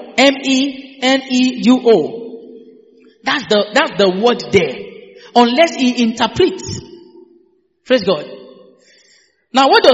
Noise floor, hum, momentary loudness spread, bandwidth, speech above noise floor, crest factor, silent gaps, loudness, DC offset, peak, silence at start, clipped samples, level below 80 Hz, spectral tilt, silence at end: -55 dBFS; none; 16 LU; 8 kHz; 42 dB; 16 dB; none; -14 LUFS; under 0.1%; 0 dBFS; 0 s; under 0.1%; -54 dBFS; -4 dB/octave; 0 s